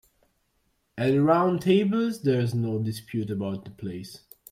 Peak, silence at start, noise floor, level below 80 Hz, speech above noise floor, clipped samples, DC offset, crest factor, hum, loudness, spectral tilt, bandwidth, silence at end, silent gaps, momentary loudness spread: -8 dBFS; 0.95 s; -71 dBFS; -64 dBFS; 47 dB; under 0.1%; under 0.1%; 18 dB; none; -25 LUFS; -7.5 dB/octave; 15.5 kHz; 0.35 s; none; 17 LU